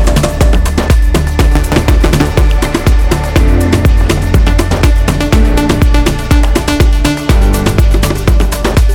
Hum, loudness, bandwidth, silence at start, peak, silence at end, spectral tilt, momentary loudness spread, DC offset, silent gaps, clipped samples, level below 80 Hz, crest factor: none; -11 LUFS; 16.5 kHz; 0 s; 0 dBFS; 0 s; -6 dB/octave; 2 LU; under 0.1%; none; under 0.1%; -10 dBFS; 8 dB